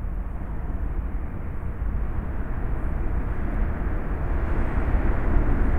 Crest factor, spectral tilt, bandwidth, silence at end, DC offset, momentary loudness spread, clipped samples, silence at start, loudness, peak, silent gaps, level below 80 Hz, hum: 16 dB; -10 dB/octave; 3.4 kHz; 0 s; under 0.1%; 8 LU; under 0.1%; 0 s; -29 LUFS; -8 dBFS; none; -26 dBFS; none